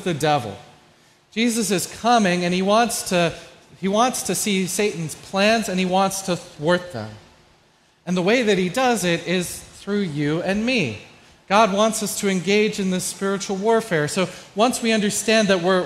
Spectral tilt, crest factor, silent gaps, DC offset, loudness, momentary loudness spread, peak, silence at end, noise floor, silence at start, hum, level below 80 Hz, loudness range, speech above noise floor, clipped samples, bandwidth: -4 dB/octave; 18 dB; none; under 0.1%; -20 LUFS; 9 LU; -2 dBFS; 0 s; -58 dBFS; 0 s; none; -56 dBFS; 2 LU; 37 dB; under 0.1%; 16 kHz